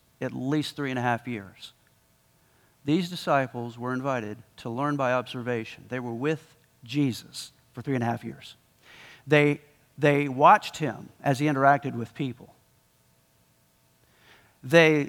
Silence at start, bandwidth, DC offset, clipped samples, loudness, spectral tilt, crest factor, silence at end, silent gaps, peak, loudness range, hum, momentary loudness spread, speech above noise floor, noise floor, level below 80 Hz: 0.2 s; 17.5 kHz; under 0.1%; under 0.1%; -26 LUFS; -6 dB/octave; 22 dB; 0 s; none; -4 dBFS; 8 LU; none; 19 LU; 39 dB; -64 dBFS; -70 dBFS